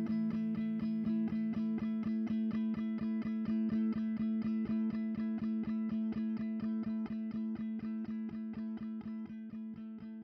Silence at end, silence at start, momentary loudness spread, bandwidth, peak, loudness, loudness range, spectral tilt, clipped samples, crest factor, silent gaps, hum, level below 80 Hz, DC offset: 0 s; 0 s; 8 LU; 5.4 kHz; -26 dBFS; -37 LUFS; 4 LU; -9.5 dB/octave; under 0.1%; 10 dB; none; none; -66 dBFS; under 0.1%